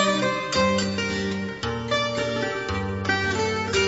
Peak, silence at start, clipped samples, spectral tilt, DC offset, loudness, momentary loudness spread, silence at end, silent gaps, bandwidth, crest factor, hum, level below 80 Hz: -8 dBFS; 0 s; under 0.1%; -4 dB/octave; under 0.1%; -24 LUFS; 6 LU; 0 s; none; 8 kHz; 16 dB; none; -46 dBFS